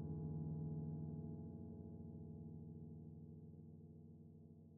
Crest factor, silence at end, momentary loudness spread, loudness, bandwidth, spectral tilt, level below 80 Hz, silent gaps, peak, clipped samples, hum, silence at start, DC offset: 14 dB; 0 s; 14 LU; -52 LUFS; 1.5 kHz; -11 dB/octave; -70 dBFS; none; -38 dBFS; under 0.1%; none; 0 s; under 0.1%